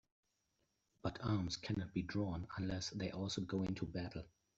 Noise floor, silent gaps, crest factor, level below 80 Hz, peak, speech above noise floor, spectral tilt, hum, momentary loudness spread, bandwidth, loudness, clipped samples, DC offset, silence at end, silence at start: -84 dBFS; none; 16 dB; -62 dBFS; -26 dBFS; 42 dB; -5.5 dB/octave; none; 6 LU; 8 kHz; -43 LUFS; under 0.1%; under 0.1%; 0.3 s; 1.05 s